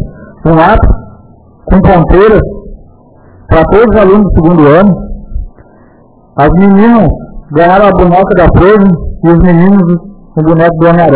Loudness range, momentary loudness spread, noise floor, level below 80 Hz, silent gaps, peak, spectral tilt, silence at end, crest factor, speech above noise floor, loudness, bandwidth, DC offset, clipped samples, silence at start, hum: 3 LU; 14 LU; -40 dBFS; -18 dBFS; none; 0 dBFS; -12 dB/octave; 0 s; 6 dB; 35 dB; -6 LUFS; 4 kHz; under 0.1%; 9%; 0 s; none